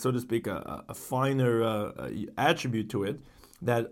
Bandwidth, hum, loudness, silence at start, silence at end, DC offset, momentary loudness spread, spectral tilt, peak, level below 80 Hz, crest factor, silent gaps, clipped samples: 17 kHz; none; -30 LUFS; 0 s; 0 s; under 0.1%; 11 LU; -6 dB/octave; -10 dBFS; -60 dBFS; 20 dB; none; under 0.1%